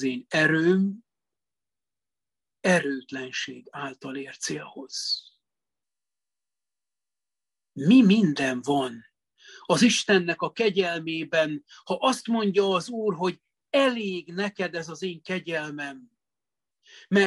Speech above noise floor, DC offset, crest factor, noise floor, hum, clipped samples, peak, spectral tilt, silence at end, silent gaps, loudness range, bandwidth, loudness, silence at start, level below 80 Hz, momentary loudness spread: over 65 dB; under 0.1%; 20 dB; under -90 dBFS; none; under 0.1%; -6 dBFS; -4.5 dB/octave; 0 s; none; 11 LU; 12 kHz; -25 LUFS; 0 s; -72 dBFS; 15 LU